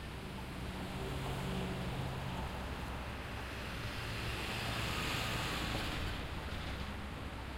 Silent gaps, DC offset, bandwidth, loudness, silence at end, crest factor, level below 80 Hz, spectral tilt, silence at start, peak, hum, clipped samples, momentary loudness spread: none; under 0.1%; 16 kHz; -40 LUFS; 0 s; 16 dB; -46 dBFS; -4.5 dB/octave; 0 s; -24 dBFS; none; under 0.1%; 7 LU